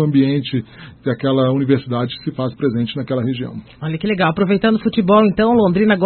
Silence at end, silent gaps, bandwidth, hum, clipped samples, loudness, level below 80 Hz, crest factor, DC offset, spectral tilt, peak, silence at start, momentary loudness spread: 0 s; none; 4.4 kHz; none; under 0.1%; -17 LUFS; -48 dBFS; 16 dB; under 0.1%; -12.5 dB/octave; 0 dBFS; 0 s; 12 LU